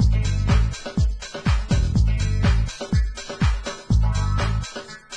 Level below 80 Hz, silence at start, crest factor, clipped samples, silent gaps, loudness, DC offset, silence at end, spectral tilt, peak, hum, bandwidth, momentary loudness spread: -24 dBFS; 0 s; 12 dB; under 0.1%; none; -23 LUFS; under 0.1%; 0 s; -6 dB/octave; -8 dBFS; none; 9.8 kHz; 7 LU